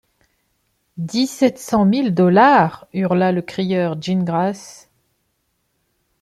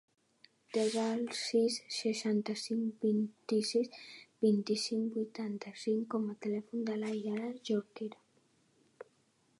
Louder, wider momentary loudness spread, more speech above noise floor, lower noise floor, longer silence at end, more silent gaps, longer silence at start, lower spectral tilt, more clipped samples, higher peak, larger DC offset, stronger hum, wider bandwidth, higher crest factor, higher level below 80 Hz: first, -17 LUFS vs -35 LUFS; about the same, 11 LU vs 9 LU; first, 52 dB vs 38 dB; second, -69 dBFS vs -73 dBFS; first, 1.5 s vs 0.55 s; neither; first, 0.95 s vs 0.7 s; first, -6.5 dB/octave vs -5 dB/octave; neither; first, -2 dBFS vs -18 dBFS; neither; neither; first, 13 kHz vs 11.5 kHz; about the same, 16 dB vs 18 dB; first, -58 dBFS vs -88 dBFS